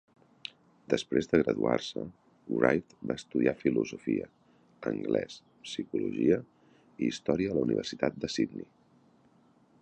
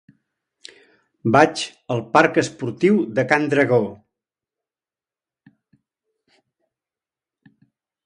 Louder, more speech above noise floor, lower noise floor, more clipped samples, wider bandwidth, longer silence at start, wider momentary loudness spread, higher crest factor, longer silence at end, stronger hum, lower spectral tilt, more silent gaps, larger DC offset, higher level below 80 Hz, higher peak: second, -31 LUFS vs -19 LUFS; second, 34 dB vs over 72 dB; second, -64 dBFS vs under -90 dBFS; neither; second, 9.2 kHz vs 11 kHz; second, 0.9 s vs 1.25 s; first, 17 LU vs 11 LU; about the same, 26 dB vs 22 dB; second, 1.15 s vs 4.1 s; neither; about the same, -6 dB/octave vs -5.5 dB/octave; neither; neither; about the same, -62 dBFS vs -62 dBFS; second, -6 dBFS vs 0 dBFS